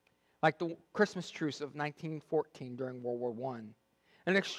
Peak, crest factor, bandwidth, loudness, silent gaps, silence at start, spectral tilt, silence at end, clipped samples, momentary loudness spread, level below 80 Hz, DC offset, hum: -14 dBFS; 22 dB; 12.5 kHz; -36 LUFS; none; 0.45 s; -5.5 dB/octave; 0 s; under 0.1%; 10 LU; -82 dBFS; under 0.1%; none